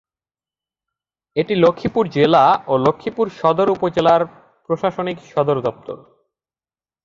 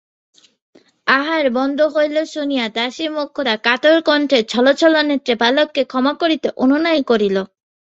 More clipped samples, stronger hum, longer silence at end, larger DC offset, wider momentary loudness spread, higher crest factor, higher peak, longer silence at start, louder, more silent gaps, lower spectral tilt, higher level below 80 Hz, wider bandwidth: neither; neither; first, 1.1 s vs 0.45 s; neither; first, 12 LU vs 8 LU; about the same, 18 dB vs 16 dB; about the same, 0 dBFS vs -2 dBFS; first, 1.35 s vs 1.05 s; about the same, -18 LUFS vs -16 LUFS; neither; first, -7.5 dB/octave vs -4 dB/octave; first, -56 dBFS vs -62 dBFS; second, 7.4 kHz vs 8.2 kHz